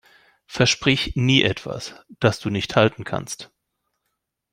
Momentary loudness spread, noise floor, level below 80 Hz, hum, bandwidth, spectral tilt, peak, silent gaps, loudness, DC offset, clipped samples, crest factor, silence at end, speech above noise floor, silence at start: 16 LU; -78 dBFS; -46 dBFS; none; 15.5 kHz; -4.5 dB/octave; -2 dBFS; none; -20 LUFS; under 0.1%; under 0.1%; 20 dB; 1.1 s; 56 dB; 0.5 s